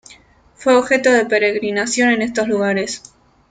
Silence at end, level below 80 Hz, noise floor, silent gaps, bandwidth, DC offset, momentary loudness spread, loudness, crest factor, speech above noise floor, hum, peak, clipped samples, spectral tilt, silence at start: 0.5 s; -56 dBFS; -48 dBFS; none; 9.6 kHz; under 0.1%; 8 LU; -16 LUFS; 16 dB; 32 dB; none; -2 dBFS; under 0.1%; -3.5 dB/octave; 0.1 s